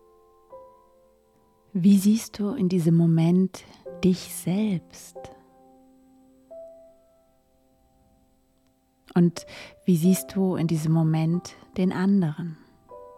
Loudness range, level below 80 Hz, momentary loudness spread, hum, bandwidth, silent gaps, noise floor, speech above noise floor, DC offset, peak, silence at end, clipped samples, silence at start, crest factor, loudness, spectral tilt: 9 LU; -62 dBFS; 22 LU; none; 15 kHz; none; -65 dBFS; 42 dB; under 0.1%; -10 dBFS; 0.1 s; under 0.1%; 0.5 s; 16 dB; -24 LUFS; -7 dB/octave